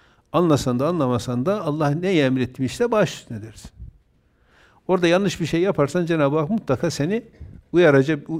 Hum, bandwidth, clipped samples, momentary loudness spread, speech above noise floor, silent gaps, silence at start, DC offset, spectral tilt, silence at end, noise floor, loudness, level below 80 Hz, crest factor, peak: none; 15.5 kHz; under 0.1%; 8 LU; 40 dB; none; 0.35 s; under 0.1%; -6.5 dB/octave; 0 s; -60 dBFS; -21 LUFS; -50 dBFS; 18 dB; -4 dBFS